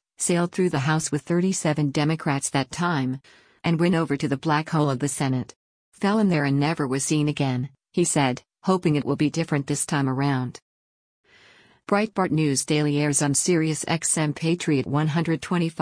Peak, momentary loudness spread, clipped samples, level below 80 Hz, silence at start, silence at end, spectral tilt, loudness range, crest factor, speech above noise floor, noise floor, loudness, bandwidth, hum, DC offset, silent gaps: -8 dBFS; 5 LU; under 0.1%; -60 dBFS; 0.2 s; 0 s; -5 dB/octave; 3 LU; 16 dB; 32 dB; -55 dBFS; -23 LUFS; 10.5 kHz; none; under 0.1%; 5.56-5.92 s, 10.62-11.24 s